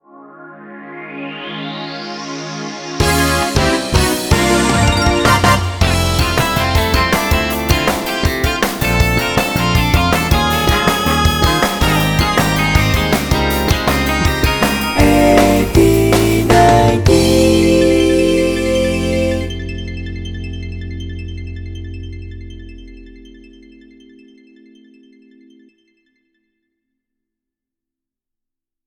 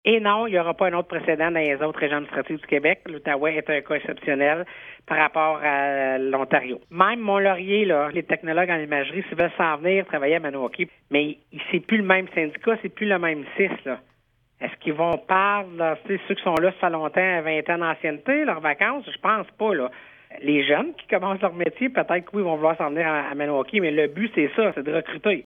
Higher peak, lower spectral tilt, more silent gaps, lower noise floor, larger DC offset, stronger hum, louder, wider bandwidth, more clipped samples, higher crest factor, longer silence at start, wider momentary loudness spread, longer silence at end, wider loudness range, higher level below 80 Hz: about the same, 0 dBFS vs 0 dBFS; second, -5 dB/octave vs -7.5 dB/octave; neither; first, -84 dBFS vs -65 dBFS; neither; neither; first, -14 LUFS vs -23 LUFS; first, over 20 kHz vs 5.6 kHz; neither; second, 14 dB vs 22 dB; about the same, 0.15 s vs 0.05 s; first, 16 LU vs 7 LU; first, 5.5 s vs 0.05 s; first, 16 LU vs 2 LU; first, -24 dBFS vs -66 dBFS